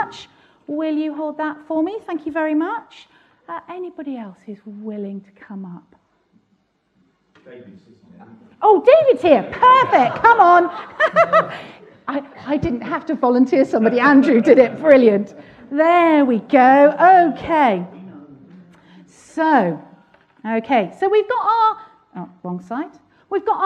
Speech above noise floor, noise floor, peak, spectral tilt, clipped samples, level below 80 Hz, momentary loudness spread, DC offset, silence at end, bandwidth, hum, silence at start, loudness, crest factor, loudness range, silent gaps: 48 dB; -64 dBFS; 0 dBFS; -7 dB/octave; under 0.1%; -56 dBFS; 21 LU; under 0.1%; 0 s; 8.8 kHz; none; 0 s; -15 LUFS; 18 dB; 19 LU; none